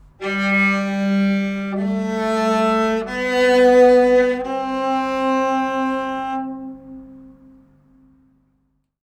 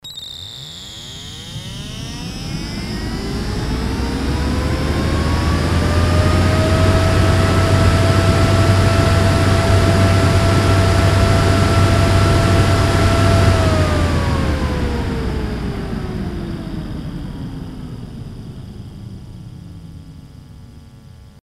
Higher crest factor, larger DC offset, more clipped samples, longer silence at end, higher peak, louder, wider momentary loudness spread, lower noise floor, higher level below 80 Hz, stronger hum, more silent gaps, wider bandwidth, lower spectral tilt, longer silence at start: about the same, 16 dB vs 16 dB; neither; neither; first, 1.75 s vs 0.2 s; about the same, -2 dBFS vs 0 dBFS; about the same, -18 LUFS vs -16 LUFS; second, 13 LU vs 17 LU; first, -67 dBFS vs -40 dBFS; second, -50 dBFS vs -24 dBFS; first, 50 Hz at -60 dBFS vs none; neither; second, 9.8 kHz vs 13 kHz; about the same, -6 dB/octave vs -6 dB/octave; first, 0.2 s vs 0.05 s